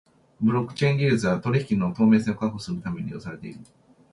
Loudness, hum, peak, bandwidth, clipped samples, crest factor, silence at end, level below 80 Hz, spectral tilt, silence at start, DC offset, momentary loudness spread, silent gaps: -24 LUFS; none; -8 dBFS; 11 kHz; under 0.1%; 16 dB; 0.5 s; -56 dBFS; -7.5 dB/octave; 0.4 s; under 0.1%; 16 LU; none